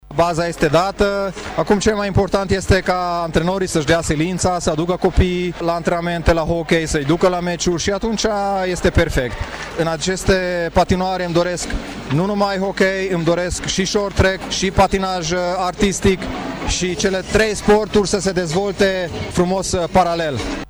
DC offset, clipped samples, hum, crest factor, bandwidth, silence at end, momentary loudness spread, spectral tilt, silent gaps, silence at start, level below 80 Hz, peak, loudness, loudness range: under 0.1%; under 0.1%; none; 14 dB; over 20 kHz; 0 s; 5 LU; -4.5 dB/octave; none; 0.05 s; -30 dBFS; -4 dBFS; -18 LUFS; 1 LU